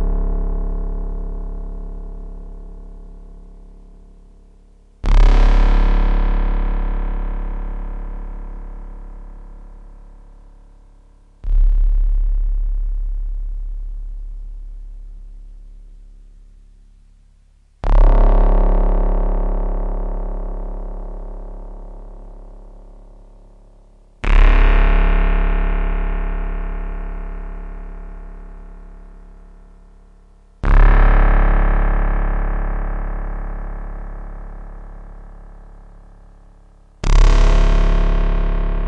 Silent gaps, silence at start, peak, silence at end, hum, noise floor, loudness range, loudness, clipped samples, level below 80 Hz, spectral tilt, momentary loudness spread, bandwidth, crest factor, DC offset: none; 0 s; 0 dBFS; 0 s; none; -50 dBFS; 18 LU; -21 LUFS; under 0.1%; -18 dBFS; -7 dB/octave; 24 LU; 6 kHz; 16 dB; under 0.1%